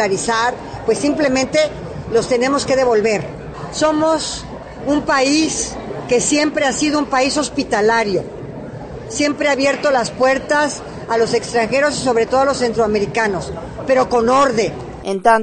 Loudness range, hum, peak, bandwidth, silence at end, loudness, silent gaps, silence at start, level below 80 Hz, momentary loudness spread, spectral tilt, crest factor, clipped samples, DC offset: 2 LU; none; -2 dBFS; 9.4 kHz; 0 s; -16 LUFS; none; 0 s; -42 dBFS; 12 LU; -3.5 dB/octave; 16 dB; under 0.1%; under 0.1%